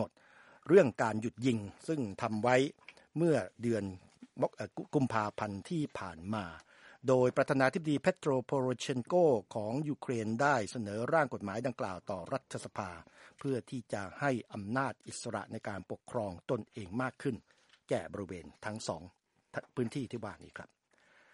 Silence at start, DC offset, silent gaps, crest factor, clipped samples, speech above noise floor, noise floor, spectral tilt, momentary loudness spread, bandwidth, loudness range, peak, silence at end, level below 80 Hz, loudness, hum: 0 s; under 0.1%; none; 24 dB; under 0.1%; 33 dB; -67 dBFS; -6 dB/octave; 14 LU; 11.5 kHz; 9 LU; -12 dBFS; 0.7 s; -70 dBFS; -34 LUFS; none